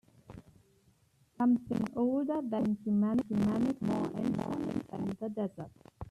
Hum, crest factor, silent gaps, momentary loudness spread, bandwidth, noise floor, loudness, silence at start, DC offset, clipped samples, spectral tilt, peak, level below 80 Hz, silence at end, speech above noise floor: none; 14 dB; none; 18 LU; 11.5 kHz; -68 dBFS; -33 LUFS; 0.3 s; under 0.1%; under 0.1%; -8.5 dB/octave; -20 dBFS; -64 dBFS; 0 s; 36 dB